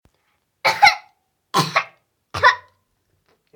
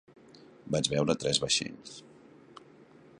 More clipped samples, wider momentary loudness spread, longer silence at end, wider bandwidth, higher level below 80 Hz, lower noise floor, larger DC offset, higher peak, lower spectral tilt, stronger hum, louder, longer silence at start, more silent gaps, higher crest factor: neither; second, 17 LU vs 21 LU; first, 0.95 s vs 0.35 s; first, over 20 kHz vs 11.5 kHz; about the same, -58 dBFS vs -62 dBFS; first, -68 dBFS vs -56 dBFS; neither; first, 0 dBFS vs -10 dBFS; about the same, -2.5 dB/octave vs -3.5 dB/octave; neither; first, -18 LUFS vs -29 LUFS; about the same, 0.65 s vs 0.65 s; neither; about the same, 22 dB vs 24 dB